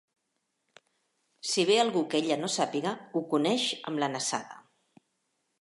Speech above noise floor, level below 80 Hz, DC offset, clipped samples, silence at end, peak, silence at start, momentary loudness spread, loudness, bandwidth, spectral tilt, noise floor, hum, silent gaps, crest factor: 51 dB; -86 dBFS; under 0.1%; under 0.1%; 1 s; -10 dBFS; 1.45 s; 10 LU; -29 LUFS; 11.5 kHz; -3.5 dB/octave; -80 dBFS; none; none; 20 dB